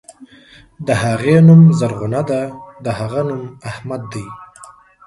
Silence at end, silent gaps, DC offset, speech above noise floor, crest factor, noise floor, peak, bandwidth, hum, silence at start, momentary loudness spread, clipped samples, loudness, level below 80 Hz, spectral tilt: 0.4 s; none; under 0.1%; 31 dB; 16 dB; -45 dBFS; 0 dBFS; 11.5 kHz; none; 0.2 s; 21 LU; under 0.1%; -14 LUFS; -48 dBFS; -8 dB/octave